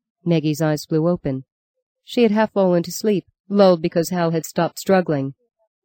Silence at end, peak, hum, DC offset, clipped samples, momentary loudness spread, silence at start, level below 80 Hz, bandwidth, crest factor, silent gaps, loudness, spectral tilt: 0.5 s; -4 dBFS; none; under 0.1%; under 0.1%; 9 LU; 0.25 s; -56 dBFS; 17 kHz; 16 dB; 1.52-1.74 s, 1.82-1.95 s, 3.40-3.44 s; -19 LUFS; -6.5 dB/octave